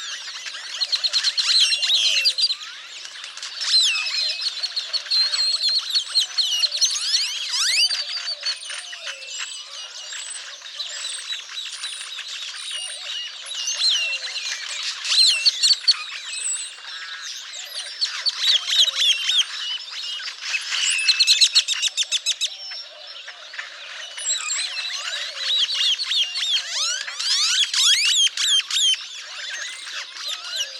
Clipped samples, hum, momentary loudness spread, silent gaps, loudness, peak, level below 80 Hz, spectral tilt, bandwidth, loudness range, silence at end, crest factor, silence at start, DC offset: under 0.1%; none; 16 LU; none; -19 LUFS; -2 dBFS; under -90 dBFS; 6.5 dB/octave; 19 kHz; 10 LU; 0 s; 22 dB; 0 s; under 0.1%